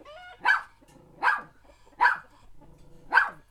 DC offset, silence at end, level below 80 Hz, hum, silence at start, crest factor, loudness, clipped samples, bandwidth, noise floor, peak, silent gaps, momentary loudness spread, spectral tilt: under 0.1%; 0.15 s; -58 dBFS; none; 0.1 s; 22 dB; -26 LUFS; under 0.1%; 12.5 kHz; -55 dBFS; -6 dBFS; none; 9 LU; -2 dB/octave